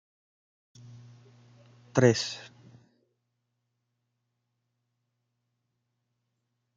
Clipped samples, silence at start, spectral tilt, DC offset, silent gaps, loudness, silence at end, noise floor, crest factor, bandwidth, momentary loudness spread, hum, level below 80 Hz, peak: under 0.1%; 1.95 s; -5.5 dB/octave; under 0.1%; none; -26 LUFS; 4.3 s; -81 dBFS; 28 dB; 9 kHz; 28 LU; 60 Hz at -55 dBFS; -74 dBFS; -6 dBFS